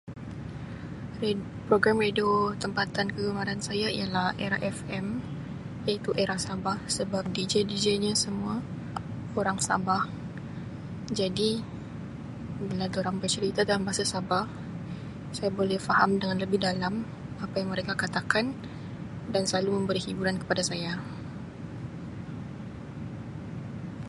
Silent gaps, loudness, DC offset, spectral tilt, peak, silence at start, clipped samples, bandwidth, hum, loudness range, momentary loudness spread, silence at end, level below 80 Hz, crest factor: none; -30 LUFS; under 0.1%; -4.5 dB/octave; -6 dBFS; 0.05 s; under 0.1%; 11.5 kHz; none; 4 LU; 14 LU; 0 s; -54 dBFS; 24 dB